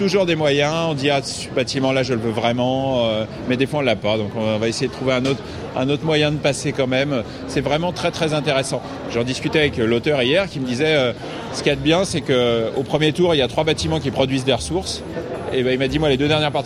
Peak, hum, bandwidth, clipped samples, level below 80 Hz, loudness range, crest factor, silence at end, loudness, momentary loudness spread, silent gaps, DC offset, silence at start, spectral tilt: -2 dBFS; none; 14 kHz; under 0.1%; -42 dBFS; 2 LU; 18 dB; 0 s; -20 LUFS; 7 LU; none; under 0.1%; 0 s; -5 dB/octave